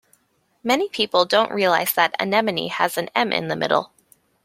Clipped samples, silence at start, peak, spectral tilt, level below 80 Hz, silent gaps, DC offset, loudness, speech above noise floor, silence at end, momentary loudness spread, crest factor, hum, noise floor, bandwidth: under 0.1%; 0.65 s; -2 dBFS; -3.5 dB/octave; -66 dBFS; none; under 0.1%; -20 LUFS; 45 dB; 0.6 s; 5 LU; 20 dB; none; -66 dBFS; 16.5 kHz